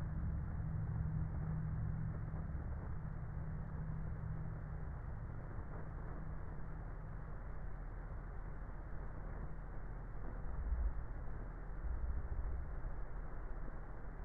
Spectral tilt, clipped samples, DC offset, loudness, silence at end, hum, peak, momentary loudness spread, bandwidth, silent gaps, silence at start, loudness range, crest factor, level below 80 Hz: -10.5 dB/octave; under 0.1%; under 0.1%; -47 LUFS; 0 s; none; -28 dBFS; 9 LU; 2.5 kHz; none; 0 s; 7 LU; 14 dB; -46 dBFS